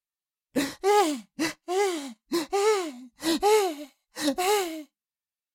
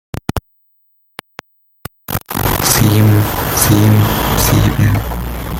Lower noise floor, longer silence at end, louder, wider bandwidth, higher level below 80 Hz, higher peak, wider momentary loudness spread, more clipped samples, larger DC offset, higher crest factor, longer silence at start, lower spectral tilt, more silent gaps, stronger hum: first, under -90 dBFS vs -58 dBFS; first, 0.7 s vs 0 s; second, -26 LUFS vs -13 LUFS; about the same, 17 kHz vs 17 kHz; second, -64 dBFS vs -26 dBFS; second, -10 dBFS vs 0 dBFS; second, 12 LU vs 21 LU; neither; neither; about the same, 16 dB vs 14 dB; first, 0.55 s vs 0.15 s; second, -2 dB/octave vs -5 dB/octave; neither; neither